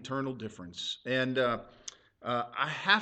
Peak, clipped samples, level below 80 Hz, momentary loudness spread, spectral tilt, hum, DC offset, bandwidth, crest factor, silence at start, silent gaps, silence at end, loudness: -8 dBFS; under 0.1%; -66 dBFS; 15 LU; -4 dB/octave; none; under 0.1%; 9 kHz; 24 dB; 0 s; none; 0 s; -33 LUFS